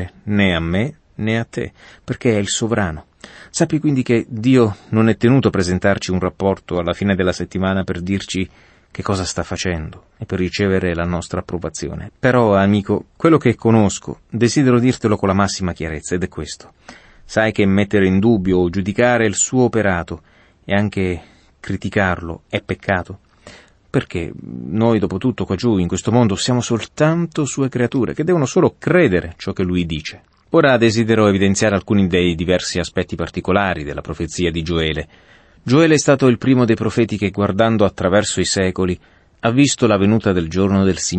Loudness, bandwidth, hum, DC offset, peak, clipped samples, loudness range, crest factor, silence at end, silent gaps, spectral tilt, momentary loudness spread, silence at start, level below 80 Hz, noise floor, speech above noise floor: -17 LUFS; 8.8 kHz; none; under 0.1%; -2 dBFS; under 0.1%; 6 LU; 16 dB; 0 s; none; -5.5 dB/octave; 12 LU; 0 s; -42 dBFS; -43 dBFS; 27 dB